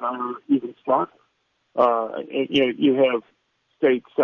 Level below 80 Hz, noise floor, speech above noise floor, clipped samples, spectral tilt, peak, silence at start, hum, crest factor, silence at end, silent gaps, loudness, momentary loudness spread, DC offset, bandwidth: -66 dBFS; -70 dBFS; 49 dB; under 0.1%; -6.5 dB/octave; -6 dBFS; 0 s; none; 16 dB; 0 s; none; -22 LUFS; 10 LU; under 0.1%; 6.6 kHz